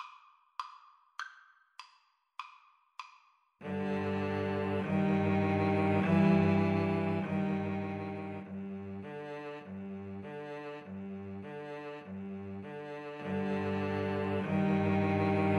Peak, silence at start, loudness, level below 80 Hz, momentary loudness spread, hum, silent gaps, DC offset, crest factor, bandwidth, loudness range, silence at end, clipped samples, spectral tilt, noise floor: -16 dBFS; 0 s; -34 LUFS; -74 dBFS; 19 LU; none; none; under 0.1%; 18 dB; 6.6 kHz; 14 LU; 0 s; under 0.1%; -8.5 dB/octave; -69 dBFS